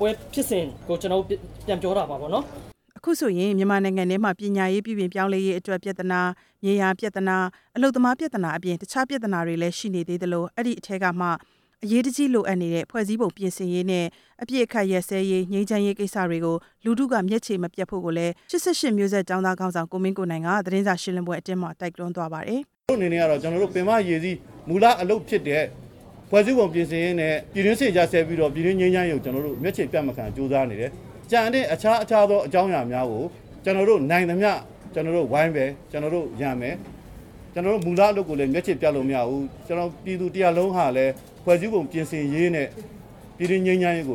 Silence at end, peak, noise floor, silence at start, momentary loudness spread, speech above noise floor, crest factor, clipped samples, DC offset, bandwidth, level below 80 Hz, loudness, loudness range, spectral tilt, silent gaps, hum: 0 s; -4 dBFS; -43 dBFS; 0 s; 9 LU; 20 dB; 18 dB; under 0.1%; under 0.1%; 17.5 kHz; -54 dBFS; -24 LUFS; 4 LU; -6 dB/octave; none; none